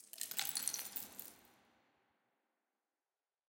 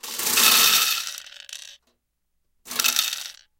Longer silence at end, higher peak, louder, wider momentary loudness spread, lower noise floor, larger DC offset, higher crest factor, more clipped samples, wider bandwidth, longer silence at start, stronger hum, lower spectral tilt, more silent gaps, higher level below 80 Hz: first, 1.95 s vs 0.25 s; second, -18 dBFS vs -2 dBFS; second, -41 LUFS vs -18 LUFS; second, 14 LU vs 24 LU; first, under -90 dBFS vs -74 dBFS; neither; first, 30 dB vs 22 dB; neither; about the same, 17 kHz vs 17 kHz; about the same, 0 s vs 0.05 s; neither; about the same, 1.5 dB/octave vs 2 dB/octave; neither; second, -90 dBFS vs -68 dBFS